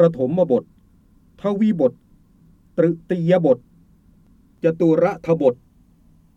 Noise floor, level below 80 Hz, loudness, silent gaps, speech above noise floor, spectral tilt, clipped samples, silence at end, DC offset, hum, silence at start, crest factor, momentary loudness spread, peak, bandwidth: -54 dBFS; -56 dBFS; -20 LUFS; none; 36 dB; -9.5 dB/octave; under 0.1%; 0.8 s; under 0.1%; none; 0 s; 18 dB; 7 LU; -2 dBFS; 7.2 kHz